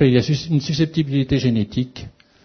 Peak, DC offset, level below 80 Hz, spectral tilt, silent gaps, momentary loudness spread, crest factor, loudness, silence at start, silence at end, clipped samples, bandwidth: -2 dBFS; under 0.1%; -44 dBFS; -7 dB/octave; none; 8 LU; 16 dB; -20 LUFS; 0 s; 0.35 s; under 0.1%; 6.6 kHz